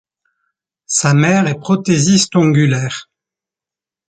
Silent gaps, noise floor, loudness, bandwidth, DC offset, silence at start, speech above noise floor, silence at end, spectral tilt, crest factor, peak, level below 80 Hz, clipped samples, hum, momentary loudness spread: none; -89 dBFS; -13 LUFS; 9.4 kHz; under 0.1%; 0.9 s; 76 dB; 1.1 s; -5 dB/octave; 14 dB; -2 dBFS; -52 dBFS; under 0.1%; none; 7 LU